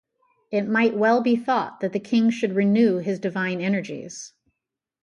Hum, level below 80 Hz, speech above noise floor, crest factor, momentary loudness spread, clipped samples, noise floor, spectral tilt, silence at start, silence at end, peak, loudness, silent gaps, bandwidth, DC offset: none; -72 dBFS; 63 dB; 16 dB; 15 LU; under 0.1%; -85 dBFS; -6 dB/octave; 0.5 s; 0.75 s; -8 dBFS; -22 LUFS; none; 8.6 kHz; under 0.1%